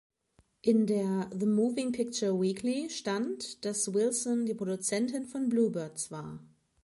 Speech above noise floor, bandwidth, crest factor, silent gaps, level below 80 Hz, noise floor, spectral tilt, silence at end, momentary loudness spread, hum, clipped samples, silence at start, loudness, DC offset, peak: 39 dB; 11.5 kHz; 16 dB; none; -72 dBFS; -69 dBFS; -5 dB/octave; 0.4 s; 8 LU; none; under 0.1%; 0.65 s; -31 LUFS; under 0.1%; -14 dBFS